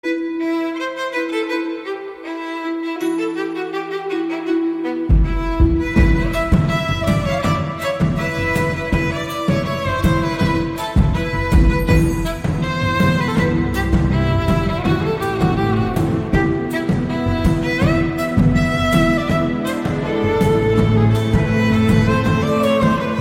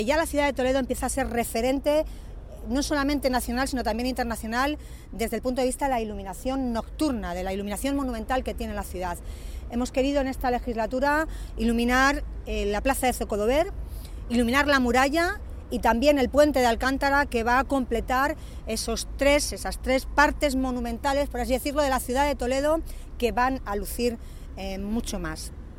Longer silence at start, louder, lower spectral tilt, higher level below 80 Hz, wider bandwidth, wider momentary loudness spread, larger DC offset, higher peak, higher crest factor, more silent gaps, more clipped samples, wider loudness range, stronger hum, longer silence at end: about the same, 0.05 s vs 0 s; first, -18 LUFS vs -26 LUFS; first, -7 dB/octave vs -4.5 dB/octave; first, -26 dBFS vs -36 dBFS; about the same, 16.5 kHz vs 17 kHz; second, 7 LU vs 12 LU; neither; first, -2 dBFS vs -6 dBFS; about the same, 16 dB vs 20 dB; neither; neither; about the same, 6 LU vs 6 LU; neither; about the same, 0 s vs 0 s